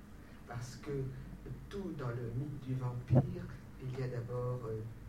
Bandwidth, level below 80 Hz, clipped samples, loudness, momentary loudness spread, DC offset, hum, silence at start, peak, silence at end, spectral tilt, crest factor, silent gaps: 11 kHz; -56 dBFS; under 0.1%; -40 LUFS; 16 LU; under 0.1%; none; 0 s; -16 dBFS; 0 s; -8.5 dB/octave; 22 dB; none